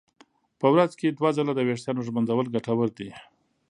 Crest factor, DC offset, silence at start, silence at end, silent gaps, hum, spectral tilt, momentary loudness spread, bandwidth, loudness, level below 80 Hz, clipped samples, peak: 20 dB; under 0.1%; 0.6 s; 0.5 s; none; none; -7 dB/octave; 8 LU; 11 kHz; -25 LUFS; -70 dBFS; under 0.1%; -6 dBFS